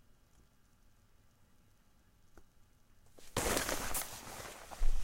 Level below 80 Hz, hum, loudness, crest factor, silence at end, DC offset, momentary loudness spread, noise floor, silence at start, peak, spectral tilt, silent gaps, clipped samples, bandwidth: -42 dBFS; none; -38 LUFS; 24 dB; 0 s; under 0.1%; 13 LU; -66 dBFS; 3.15 s; -14 dBFS; -2.5 dB/octave; none; under 0.1%; 16 kHz